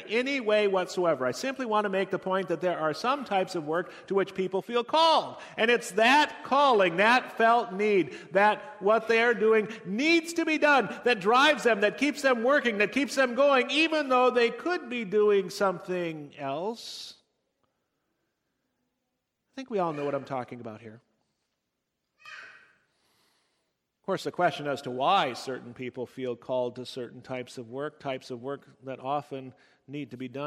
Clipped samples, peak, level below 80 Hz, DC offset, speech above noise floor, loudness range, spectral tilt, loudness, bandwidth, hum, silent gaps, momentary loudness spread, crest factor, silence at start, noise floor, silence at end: under 0.1%; -10 dBFS; -76 dBFS; under 0.1%; 55 dB; 13 LU; -4 dB/octave; -26 LUFS; 15.5 kHz; none; none; 16 LU; 18 dB; 0 s; -82 dBFS; 0 s